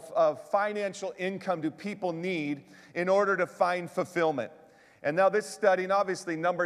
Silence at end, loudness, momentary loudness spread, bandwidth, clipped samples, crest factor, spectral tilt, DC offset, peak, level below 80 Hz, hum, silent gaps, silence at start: 0 s; -29 LUFS; 10 LU; 13.5 kHz; under 0.1%; 18 dB; -5 dB/octave; under 0.1%; -10 dBFS; -80 dBFS; none; none; 0 s